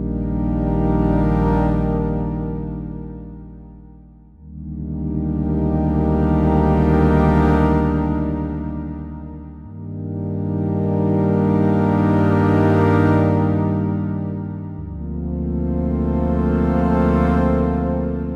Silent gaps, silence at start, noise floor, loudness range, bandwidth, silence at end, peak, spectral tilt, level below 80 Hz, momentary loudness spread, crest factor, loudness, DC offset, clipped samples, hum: none; 0 s; -44 dBFS; 8 LU; 5.6 kHz; 0 s; -4 dBFS; -10.5 dB/octave; -28 dBFS; 15 LU; 16 dB; -19 LUFS; under 0.1%; under 0.1%; none